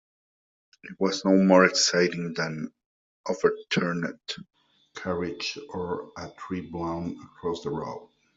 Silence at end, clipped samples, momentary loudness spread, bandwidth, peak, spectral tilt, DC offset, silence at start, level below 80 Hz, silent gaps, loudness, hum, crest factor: 0.3 s; under 0.1%; 19 LU; 7.8 kHz; -4 dBFS; -4.5 dB/octave; under 0.1%; 0.85 s; -64 dBFS; 2.86-3.24 s; -26 LUFS; none; 24 dB